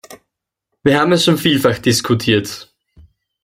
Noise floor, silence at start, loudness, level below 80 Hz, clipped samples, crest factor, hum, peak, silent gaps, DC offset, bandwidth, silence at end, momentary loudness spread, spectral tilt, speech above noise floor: -77 dBFS; 0.1 s; -14 LUFS; -50 dBFS; under 0.1%; 16 dB; none; -2 dBFS; none; under 0.1%; 16.5 kHz; 0.8 s; 7 LU; -4.5 dB/octave; 63 dB